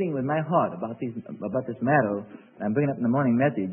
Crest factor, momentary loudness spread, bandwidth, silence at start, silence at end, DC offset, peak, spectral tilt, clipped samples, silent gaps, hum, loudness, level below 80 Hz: 18 dB; 11 LU; 3.2 kHz; 0 s; 0 s; under 0.1%; -8 dBFS; -12.5 dB/octave; under 0.1%; none; none; -26 LUFS; -68 dBFS